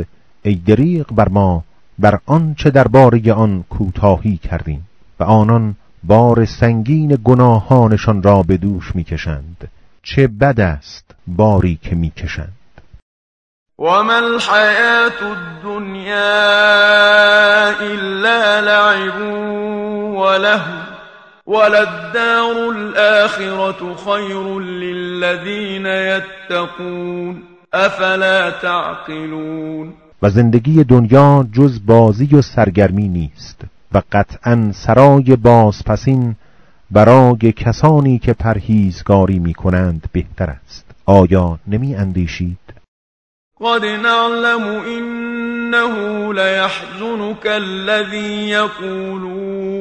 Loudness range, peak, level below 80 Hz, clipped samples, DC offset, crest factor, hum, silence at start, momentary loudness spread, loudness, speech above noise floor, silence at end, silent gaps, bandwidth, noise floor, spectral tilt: 7 LU; 0 dBFS; -34 dBFS; 0.5%; under 0.1%; 14 dB; none; 0 s; 15 LU; -13 LUFS; 29 dB; 0 s; 13.02-13.66 s, 42.88-43.51 s; 9.2 kHz; -42 dBFS; -7 dB/octave